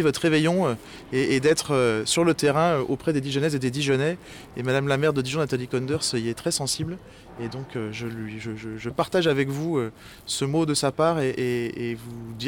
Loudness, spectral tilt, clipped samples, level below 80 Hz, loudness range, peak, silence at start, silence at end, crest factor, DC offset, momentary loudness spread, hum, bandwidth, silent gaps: -25 LUFS; -5 dB/octave; under 0.1%; -54 dBFS; 6 LU; -8 dBFS; 0 s; 0 s; 18 dB; under 0.1%; 13 LU; none; 18.5 kHz; none